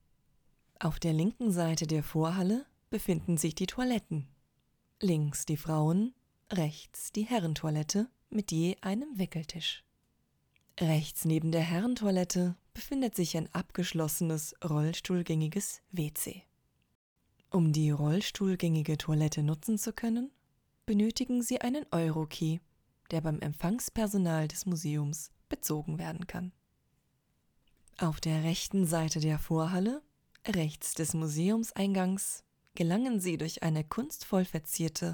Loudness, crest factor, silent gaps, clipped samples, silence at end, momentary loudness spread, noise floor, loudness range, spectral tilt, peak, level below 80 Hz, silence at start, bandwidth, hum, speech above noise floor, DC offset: -32 LUFS; 18 dB; 16.95-17.16 s; under 0.1%; 0 s; 7 LU; -75 dBFS; 3 LU; -5.5 dB/octave; -16 dBFS; -56 dBFS; 0.8 s; over 20 kHz; none; 43 dB; under 0.1%